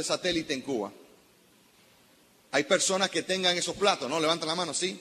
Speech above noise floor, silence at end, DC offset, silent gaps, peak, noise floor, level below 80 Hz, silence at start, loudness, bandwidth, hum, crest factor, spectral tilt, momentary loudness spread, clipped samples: 33 dB; 0 s; under 0.1%; none; -8 dBFS; -61 dBFS; -66 dBFS; 0 s; -27 LUFS; 14 kHz; none; 22 dB; -2.5 dB/octave; 7 LU; under 0.1%